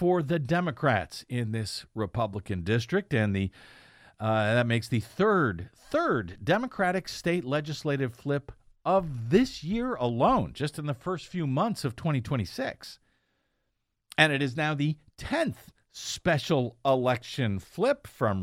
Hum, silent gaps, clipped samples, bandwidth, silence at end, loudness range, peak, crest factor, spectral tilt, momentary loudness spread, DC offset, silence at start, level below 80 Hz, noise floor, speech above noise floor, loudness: none; none; under 0.1%; 16 kHz; 0 s; 3 LU; -4 dBFS; 24 dB; -6 dB/octave; 9 LU; under 0.1%; 0 s; -54 dBFS; -79 dBFS; 51 dB; -28 LUFS